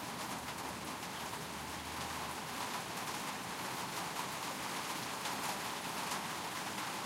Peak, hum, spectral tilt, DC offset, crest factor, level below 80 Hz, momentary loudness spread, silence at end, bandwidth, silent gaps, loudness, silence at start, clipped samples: -26 dBFS; none; -2 dB/octave; under 0.1%; 16 dB; -66 dBFS; 4 LU; 0 s; 16 kHz; none; -40 LUFS; 0 s; under 0.1%